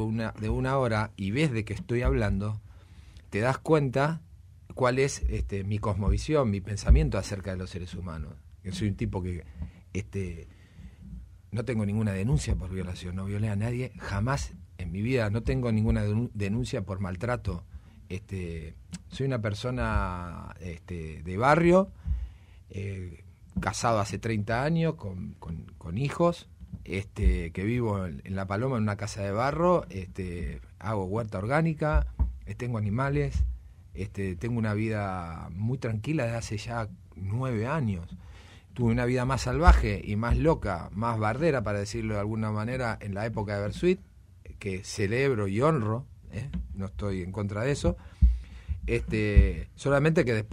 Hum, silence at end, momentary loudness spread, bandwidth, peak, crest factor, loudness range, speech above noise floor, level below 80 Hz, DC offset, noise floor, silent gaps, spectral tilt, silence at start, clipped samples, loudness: none; 0 s; 14 LU; 11.5 kHz; -6 dBFS; 22 dB; 6 LU; 22 dB; -36 dBFS; under 0.1%; -50 dBFS; none; -7 dB/octave; 0 s; under 0.1%; -29 LUFS